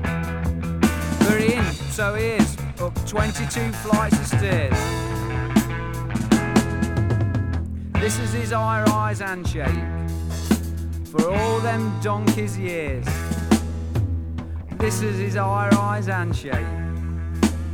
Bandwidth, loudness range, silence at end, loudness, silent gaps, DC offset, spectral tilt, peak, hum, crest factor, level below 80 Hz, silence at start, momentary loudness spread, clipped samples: 19.5 kHz; 2 LU; 0 s; -23 LUFS; none; under 0.1%; -6 dB/octave; -2 dBFS; none; 20 dB; -32 dBFS; 0 s; 8 LU; under 0.1%